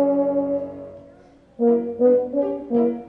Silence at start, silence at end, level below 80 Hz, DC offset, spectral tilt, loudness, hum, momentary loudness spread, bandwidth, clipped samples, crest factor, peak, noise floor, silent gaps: 0 s; 0 s; -60 dBFS; under 0.1%; -10.5 dB/octave; -21 LUFS; none; 14 LU; 3.2 kHz; under 0.1%; 14 dB; -8 dBFS; -50 dBFS; none